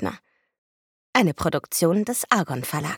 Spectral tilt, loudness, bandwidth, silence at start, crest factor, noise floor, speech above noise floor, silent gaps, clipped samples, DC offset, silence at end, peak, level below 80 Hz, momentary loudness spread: -4.5 dB/octave; -23 LUFS; 19 kHz; 0 s; 24 dB; under -90 dBFS; over 67 dB; 0.58-1.13 s; under 0.1%; under 0.1%; 0 s; -2 dBFS; -54 dBFS; 6 LU